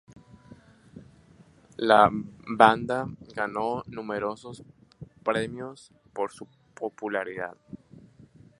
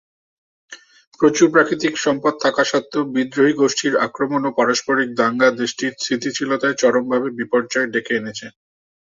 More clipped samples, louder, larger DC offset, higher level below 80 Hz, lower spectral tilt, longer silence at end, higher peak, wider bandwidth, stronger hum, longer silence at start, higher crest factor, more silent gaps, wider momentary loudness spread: neither; second, -26 LUFS vs -18 LUFS; neither; about the same, -62 dBFS vs -64 dBFS; first, -5.5 dB/octave vs -3.5 dB/octave; first, 0.85 s vs 0.5 s; about the same, 0 dBFS vs -2 dBFS; first, 11.5 kHz vs 7.8 kHz; neither; second, 0.5 s vs 0.7 s; first, 28 dB vs 18 dB; second, none vs 1.07-1.12 s; first, 27 LU vs 7 LU